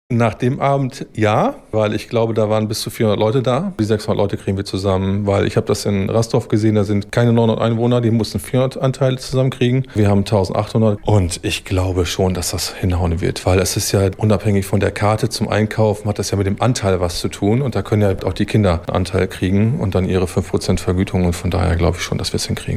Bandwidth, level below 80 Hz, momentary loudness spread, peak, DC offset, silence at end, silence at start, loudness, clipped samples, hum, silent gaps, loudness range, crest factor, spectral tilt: 15.5 kHz; -36 dBFS; 4 LU; -2 dBFS; under 0.1%; 0 s; 0.1 s; -17 LUFS; under 0.1%; none; none; 1 LU; 14 dB; -6 dB/octave